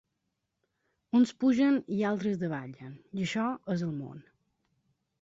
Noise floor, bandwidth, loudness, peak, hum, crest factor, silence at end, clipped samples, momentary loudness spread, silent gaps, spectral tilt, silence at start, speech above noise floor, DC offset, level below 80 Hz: -82 dBFS; 7.8 kHz; -30 LUFS; -14 dBFS; none; 16 dB; 1 s; under 0.1%; 15 LU; none; -6.5 dB/octave; 1.15 s; 53 dB; under 0.1%; -70 dBFS